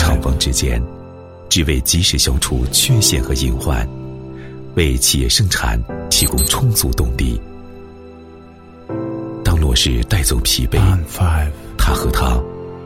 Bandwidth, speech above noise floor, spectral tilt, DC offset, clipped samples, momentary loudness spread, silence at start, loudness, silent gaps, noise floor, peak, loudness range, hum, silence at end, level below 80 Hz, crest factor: 16.5 kHz; 24 dB; -3.5 dB/octave; 0.2%; under 0.1%; 15 LU; 0 s; -16 LUFS; none; -39 dBFS; 0 dBFS; 4 LU; none; 0 s; -22 dBFS; 16 dB